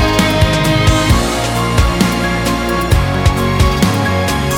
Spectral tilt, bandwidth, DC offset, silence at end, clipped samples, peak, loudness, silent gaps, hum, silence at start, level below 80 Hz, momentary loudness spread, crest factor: -5 dB/octave; 18 kHz; under 0.1%; 0 s; under 0.1%; 0 dBFS; -13 LUFS; none; none; 0 s; -20 dBFS; 4 LU; 12 dB